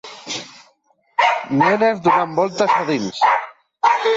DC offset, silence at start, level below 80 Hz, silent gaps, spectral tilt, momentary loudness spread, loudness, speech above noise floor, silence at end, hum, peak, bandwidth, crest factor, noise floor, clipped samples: under 0.1%; 0.05 s; -64 dBFS; none; -4.5 dB/octave; 13 LU; -18 LUFS; 44 dB; 0 s; none; -4 dBFS; 7.8 kHz; 14 dB; -60 dBFS; under 0.1%